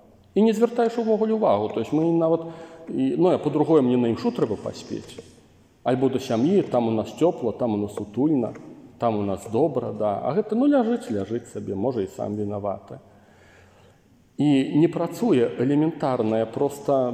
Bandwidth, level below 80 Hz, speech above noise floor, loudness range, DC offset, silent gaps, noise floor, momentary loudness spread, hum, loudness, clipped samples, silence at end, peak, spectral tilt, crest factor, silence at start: 15 kHz; -64 dBFS; 34 dB; 4 LU; under 0.1%; none; -56 dBFS; 11 LU; none; -23 LUFS; under 0.1%; 0 s; -6 dBFS; -7.5 dB/octave; 16 dB; 0.35 s